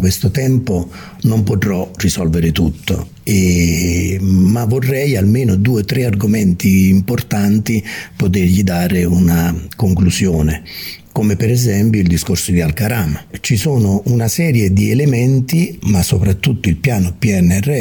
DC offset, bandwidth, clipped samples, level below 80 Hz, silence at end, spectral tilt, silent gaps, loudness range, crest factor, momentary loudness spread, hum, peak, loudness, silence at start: under 0.1%; 18 kHz; under 0.1%; -32 dBFS; 0 s; -6 dB/octave; none; 2 LU; 12 dB; 6 LU; none; 0 dBFS; -14 LUFS; 0 s